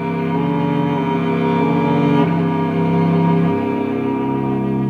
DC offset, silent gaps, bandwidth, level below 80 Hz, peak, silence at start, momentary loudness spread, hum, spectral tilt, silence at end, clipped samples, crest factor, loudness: under 0.1%; none; 5 kHz; -52 dBFS; -2 dBFS; 0 s; 4 LU; none; -9.5 dB/octave; 0 s; under 0.1%; 14 dB; -17 LUFS